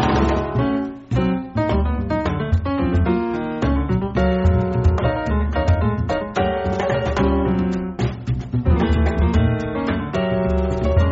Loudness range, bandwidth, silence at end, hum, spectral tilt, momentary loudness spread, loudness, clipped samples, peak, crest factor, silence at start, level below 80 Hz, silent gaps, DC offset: 1 LU; 7.6 kHz; 0 s; none; -7 dB/octave; 5 LU; -20 LUFS; under 0.1%; -4 dBFS; 14 dB; 0 s; -26 dBFS; none; under 0.1%